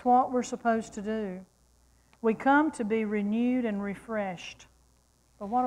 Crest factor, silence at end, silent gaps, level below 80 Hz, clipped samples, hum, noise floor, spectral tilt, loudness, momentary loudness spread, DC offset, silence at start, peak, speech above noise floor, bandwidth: 16 dB; 0 s; none; -64 dBFS; under 0.1%; none; -65 dBFS; -6 dB/octave; -29 LUFS; 14 LU; under 0.1%; 0 s; -14 dBFS; 37 dB; 11 kHz